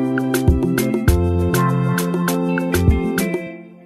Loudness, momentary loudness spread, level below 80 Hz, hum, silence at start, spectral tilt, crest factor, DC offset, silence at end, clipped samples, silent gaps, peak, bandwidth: -18 LUFS; 4 LU; -26 dBFS; none; 0 s; -6.5 dB/octave; 16 dB; under 0.1%; 0.15 s; under 0.1%; none; -2 dBFS; 15.5 kHz